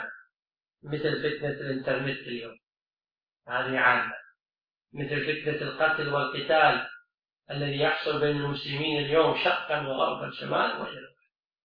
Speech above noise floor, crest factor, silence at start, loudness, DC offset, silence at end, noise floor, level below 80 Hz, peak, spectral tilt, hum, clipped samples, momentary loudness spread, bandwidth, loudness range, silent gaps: over 62 dB; 22 dB; 0 s; -27 LUFS; under 0.1%; 0.55 s; under -90 dBFS; -66 dBFS; -8 dBFS; -7.5 dB/octave; none; under 0.1%; 15 LU; 5.4 kHz; 5 LU; 0.39-0.43 s, 2.82-2.86 s, 2.93-2.97 s